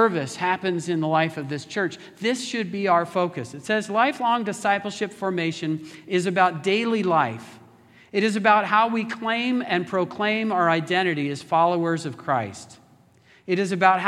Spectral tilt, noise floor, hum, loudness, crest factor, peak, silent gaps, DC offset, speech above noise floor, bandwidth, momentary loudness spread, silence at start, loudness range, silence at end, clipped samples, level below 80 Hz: -5 dB/octave; -56 dBFS; none; -23 LUFS; 22 dB; -2 dBFS; none; under 0.1%; 33 dB; 13.5 kHz; 8 LU; 0 s; 3 LU; 0 s; under 0.1%; -74 dBFS